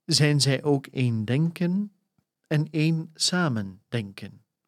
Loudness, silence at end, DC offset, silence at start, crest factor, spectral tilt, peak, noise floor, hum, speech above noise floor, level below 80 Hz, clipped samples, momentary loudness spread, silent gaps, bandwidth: -25 LUFS; 0.4 s; under 0.1%; 0.1 s; 20 dB; -5 dB/octave; -6 dBFS; -73 dBFS; none; 49 dB; -72 dBFS; under 0.1%; 12 LU; none; 14 kHz